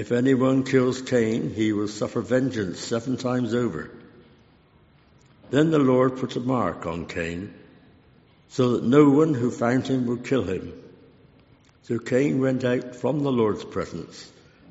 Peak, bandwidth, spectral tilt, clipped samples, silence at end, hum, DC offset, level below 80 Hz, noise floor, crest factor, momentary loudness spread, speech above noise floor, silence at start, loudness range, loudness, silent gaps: -4 dBFS; 8 kHz; -6.5 dB/octave; under 0.1%; 0.45 s; none; under 0.1%; -58 dBFS; -57 dBFS; 20 dB; 12 LU; 34 dB; 0 s; 4 LU; -23 LUFS; none